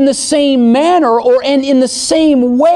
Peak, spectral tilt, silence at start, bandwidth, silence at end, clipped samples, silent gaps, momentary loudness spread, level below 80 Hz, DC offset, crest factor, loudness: -2 dBFS; -3.5 dB/octave; 0 s; 12 kHz; 0 s; under 0.1%; none; 2 LU; -48 dBFS; under 0.1%; 8 dB; -10 LUFS